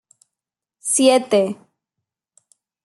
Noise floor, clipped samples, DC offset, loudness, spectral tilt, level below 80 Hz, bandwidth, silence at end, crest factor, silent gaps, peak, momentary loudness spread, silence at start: -87 dBFS; under 0.1%; under 0.1%; -17 LUFS; -3 dB/octave; -74 dBFS; 12.5 kHz; 1.3 s; 20 dB; none; -2 dBFS; 15 LU; 0.85 s